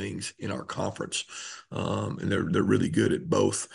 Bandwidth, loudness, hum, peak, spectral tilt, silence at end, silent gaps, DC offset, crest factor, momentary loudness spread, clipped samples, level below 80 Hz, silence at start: 11.5 kHz; -28 LUFS; none; -10 dBFS; -5 dB/octave; 0 s; none; under 0.1%; 18 dB; 10 LU; under 0.1%; -60 dBFS; 0 s